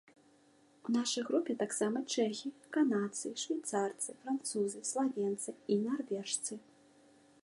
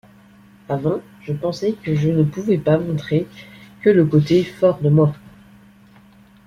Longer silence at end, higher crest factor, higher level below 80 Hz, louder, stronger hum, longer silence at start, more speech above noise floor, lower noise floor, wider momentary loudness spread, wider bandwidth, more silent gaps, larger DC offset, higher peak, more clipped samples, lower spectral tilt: second, 0.85 s vs 1.15 s; about the same, 16 dB vs 16 dB; second, -88 dBFS vs -52 dBFS; second, -36 LUFS vs -19 LUFS; neither; first, 0.85 s vs 0.7 s; about the same, 31 dB vs 31 dB; first, -66 dBFS vs -48 dBFS; second, 6 LU vs 12 LU; first, 11.5 kHz vs 7.2 kHz; neither; neither; second, -20 dBFS vs -2 dBFS; neither; second, -3.5 dB/octave vs -8.5 dB/octave